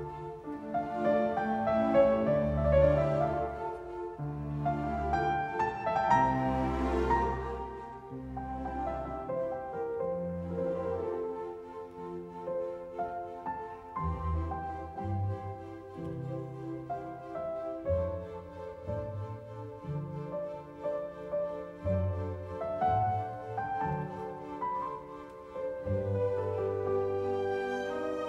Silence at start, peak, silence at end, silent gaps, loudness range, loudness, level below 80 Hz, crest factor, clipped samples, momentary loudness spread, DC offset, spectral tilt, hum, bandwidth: 0 s; -12 dBFS; 0 s; none; 9 LU; -33 LUFS; -46 dBFS; 20 dB; under 0.1%; 14 LU; under 0.1%; -8.5 dB/octave; none; 9.6 kHz